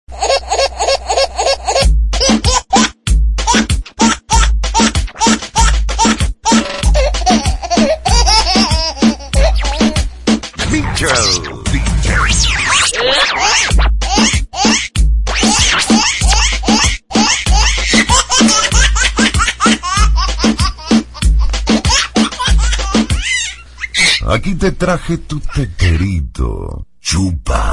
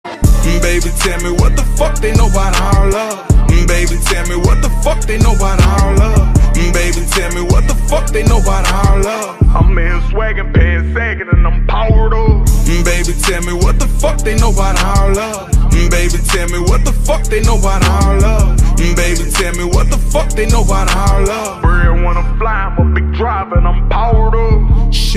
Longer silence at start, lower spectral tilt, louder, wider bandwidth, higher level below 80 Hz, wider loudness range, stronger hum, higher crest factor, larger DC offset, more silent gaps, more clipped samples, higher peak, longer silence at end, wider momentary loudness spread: about the same, 0.1 s vs 0.05 s; second, -3.5 dB/octave vs -5 dB/octave; about the same, -12 LUFS vs -13 LUFS; second, 11.5 kHz vs 15 kHz; about the same, -16 dBFS vs -12 dBFS; first, 4 LU vs 1 LU; neither; about the same, 12 dB vs 10 dB; neither; neither; neither; about the same, 0 dBFS vs 0 dBFS; about the same, 0 s vs 0 s; first, 7 LU vs 4 LU